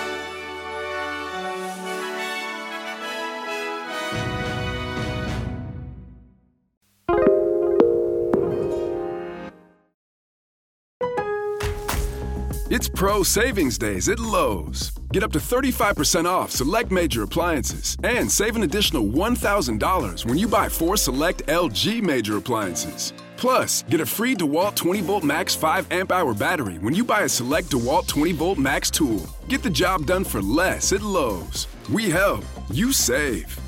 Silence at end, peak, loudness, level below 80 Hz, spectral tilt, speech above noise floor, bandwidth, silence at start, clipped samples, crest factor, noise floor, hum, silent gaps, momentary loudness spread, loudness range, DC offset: 0 s; -2 dBFS; -22 LUFS; -36 dBFS; -3.5 dB/octave; 37 dB; 16.5 kHz; 0 s; under 0.1%; 20 dB; -58 dBFS; none; 6.77-6.81 s, 9.94-11.00 s; 10 LU; 7 LU; under 0.1%